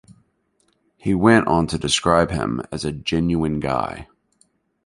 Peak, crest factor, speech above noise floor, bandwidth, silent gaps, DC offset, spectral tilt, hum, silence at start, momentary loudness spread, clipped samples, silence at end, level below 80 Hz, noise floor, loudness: -2 dBFS; 20 dB; 46 dB; 11.5 kHz; none; under 0.1%; -5 dB/octave; none; 1.05 s; 12 LU; under 0.1%; 0.8 s; -40 dBFS; -66 dBFS; -20 LUFS